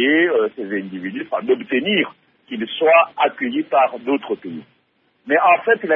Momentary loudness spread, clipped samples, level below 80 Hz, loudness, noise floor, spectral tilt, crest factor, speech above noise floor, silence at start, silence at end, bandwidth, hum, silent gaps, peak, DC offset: 14 LU; under 0.1%; -72 dBFS; -18 LUFS; -63 dBFS; -8 dB/octave; 16 dB; 45 dB; 0 s; 0 s; 3.9 kHz; none; none; -2 dBFS; under 0.1%